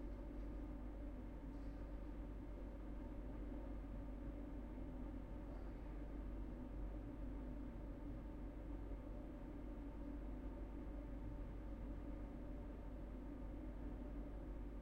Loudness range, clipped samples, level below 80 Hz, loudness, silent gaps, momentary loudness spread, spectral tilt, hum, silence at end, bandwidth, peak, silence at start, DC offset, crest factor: 1 LU; under 0.1%; -52 dBFS; -53 LUFS; none; 2 LU; -9 dB/octave; none; 0 s; 4.7 kHz; -38 dBFS; 0 s; under 0.1%; 12 dB